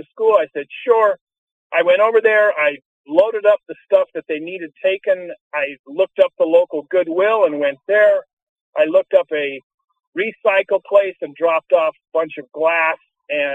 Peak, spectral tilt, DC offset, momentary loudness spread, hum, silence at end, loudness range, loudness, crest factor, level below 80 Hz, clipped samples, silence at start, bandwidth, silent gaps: -2 dBFS; -5.5 dB/octave; under 0.1%; 11 LU; none; 0 s; 3 LU; -17 LUFS; 16 dB; -72 dBFS; under 0.1%; 0.15 s; 4 kHz; 1.21-1.27 s, 1.38-1.70 s, 2.85-3.04 s, 5.41-5.51 s, 5.79-5.84 s, 8.33-8.73 s, 9.63-9.78 s, 10.07-10.12 s